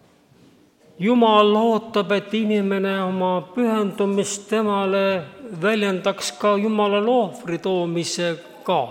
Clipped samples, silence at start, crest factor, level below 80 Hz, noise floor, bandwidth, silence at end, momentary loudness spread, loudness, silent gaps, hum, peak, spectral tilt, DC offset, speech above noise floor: under 0.1%; 1 s; 16 dB; -70 dBFS; -53 dBFS; 16 kHz; 0 s; 8 LU; -21 LUFS; none; none; -4 dBFS; -5 dB/octave; under 0.1%; 33 dB